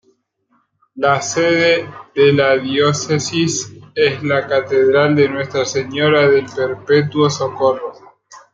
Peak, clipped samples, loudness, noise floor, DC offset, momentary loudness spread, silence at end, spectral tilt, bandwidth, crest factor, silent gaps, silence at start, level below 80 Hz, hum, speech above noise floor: -2 dBFS; under 0.1%; -15 LUFS; -62 dBFS; under 0.1%; 7 LU; 0.15 s; -4.5 dB/octave; 9 kHz; 14 dB; none; 0.95 s; -58 dBFS; none; 47 dB